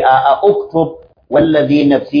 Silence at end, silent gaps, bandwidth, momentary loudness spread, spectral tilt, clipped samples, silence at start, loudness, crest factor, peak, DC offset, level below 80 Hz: 0 s; none; 5.2 kHz; 7 LU; -8.5 dB/octave; under 0.1%; 0 s; -12 LUFS; 12 dB; 0 dBFS; under 0.1%; -46 dBFS